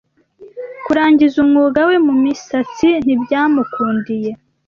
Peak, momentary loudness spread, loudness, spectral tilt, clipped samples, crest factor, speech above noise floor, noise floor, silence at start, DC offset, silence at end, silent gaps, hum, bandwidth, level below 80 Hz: -2 dBFS; 11 LU; -14 LUFS; -6 dB/octave; under 0.1%; 12 dB; 29 dB; -43 dBFS; 0.4 s; under 0.1%; 0.3 s; none; none; 7 kHz; -52 dBFS